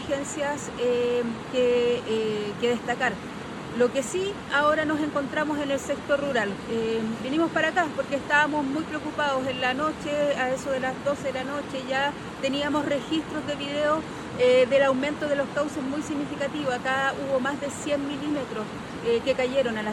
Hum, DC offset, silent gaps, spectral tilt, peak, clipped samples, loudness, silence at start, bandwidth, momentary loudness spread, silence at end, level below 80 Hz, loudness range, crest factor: none; under 0.1%; none; -4.5 dB/octave; -10 dBFS; under 0.1%; -26 LUFS; 0 s; 12.5 kHz; 8 LU; 0 s; -56 dBFS; 3 LU; 16 dB